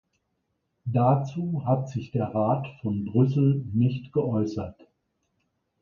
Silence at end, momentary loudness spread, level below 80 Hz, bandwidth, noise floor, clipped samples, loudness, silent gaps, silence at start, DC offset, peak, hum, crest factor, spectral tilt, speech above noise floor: 1.1 s; 8 LU; -56 dBFS; 7 kHz; -77 dBFS; under 0.1%; -26 LUFS; none; 0.85 s; under 0.1%; -10 dBFS; none; 18 dB; -10 dB/octave; 52 dB